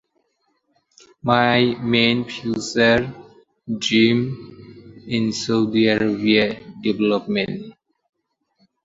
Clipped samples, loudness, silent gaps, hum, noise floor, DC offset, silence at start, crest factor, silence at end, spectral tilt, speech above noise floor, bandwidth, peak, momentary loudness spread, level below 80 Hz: under 0.1%; -19 LUFS; none; none; -69 dBFS; under 0.1%; 1.25 s; 20 dB; 1.15 s; -5 dB/octave; 50 dB; 7.8 kHz; 0 dBFS; 12 LU; -54 dBFS